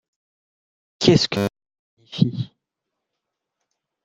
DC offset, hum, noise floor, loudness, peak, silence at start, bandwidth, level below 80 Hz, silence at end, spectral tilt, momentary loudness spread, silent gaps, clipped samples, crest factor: under 0.1%; none; -82 dBFS; -20 LUFS; -2 dBFS; 1 s; 13.5 kHz; -56 dBFS; 1.6 s; -5.5 dB/octave; 17 LU; 1.79-1.97 s; under 0.1%; 24 dB